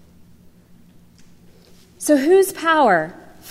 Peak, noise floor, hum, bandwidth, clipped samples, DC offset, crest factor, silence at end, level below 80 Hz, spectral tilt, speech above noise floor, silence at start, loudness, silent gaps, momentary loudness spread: -4 dBFS; -48 dBFS; none; 16 kHz; under 0.1%; under 0.1%; 16 dB; 0 s; -58 dBFS; -4 dB/octave; 33 dB; 2 s; -16 LUFS; none; 11 LU